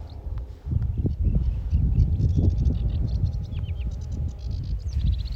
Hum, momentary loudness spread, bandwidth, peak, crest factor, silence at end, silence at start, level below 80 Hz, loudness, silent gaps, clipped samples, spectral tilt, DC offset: none; 9 LU; 6.6 kHz; -8 dBFS; 16 dB; 0 s; 0 s; -26 dBFS; -27 LUFS; none; under 0.1%; -9 dB/octave; under 0.1%